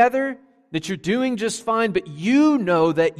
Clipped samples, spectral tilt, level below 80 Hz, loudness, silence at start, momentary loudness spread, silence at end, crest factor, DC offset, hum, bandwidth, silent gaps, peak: under 0.1%; -5.5 dB/octave; -58 dBFS; -21 LUFS; 0 s; 11 LU; 0.05 s; 16 dB; under 0.1%; none; 14 kHz; none; -4 dBFS